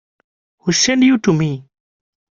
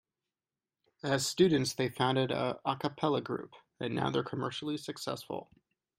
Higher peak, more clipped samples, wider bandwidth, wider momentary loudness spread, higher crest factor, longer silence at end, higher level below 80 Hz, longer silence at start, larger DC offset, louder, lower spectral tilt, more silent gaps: first, -2 dBFS vs -14 dBFS; neither; second, 7.6 kHz vs 16 kHz; about the same, 12 LU vs 13 LU; about the same, 16 dB vs 20 dB; first, 0.7 s vs 0.55 s; first, -54 dBFS vs -70 dBFS; second, 0.65 s vs 1.05 s; neither; first, -15 LUFS vs -33 LUFS; about the same, -4 dB/octave vs -5 dB/octave; neither